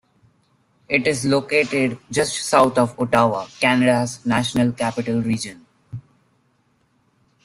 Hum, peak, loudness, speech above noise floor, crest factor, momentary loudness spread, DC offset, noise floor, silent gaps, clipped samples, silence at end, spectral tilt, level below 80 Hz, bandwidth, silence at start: none; -2 dBFS; -19 LUFS; 44 dB; 20 dB; 9 LU; under 0.1%; -63 dBFS; none; under 0.1%; 1.45 s; -4.5 dB/octave; -56 dBFS; 13.5 kHz; 0.9 s